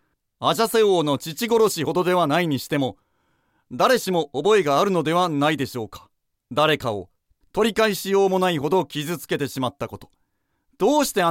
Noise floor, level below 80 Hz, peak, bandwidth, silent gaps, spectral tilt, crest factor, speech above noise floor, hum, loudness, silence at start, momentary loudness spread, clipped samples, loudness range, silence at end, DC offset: -71 dBFS; -58 dBFS; -4 dBFS; 16.5 kHz; none; -4.5 dB/octave; 18 dB; 50 dB; none; -21 LUFS; 0.4 s; 10 LU; under 0.1%; 2 LU; 0 s; under 0.1%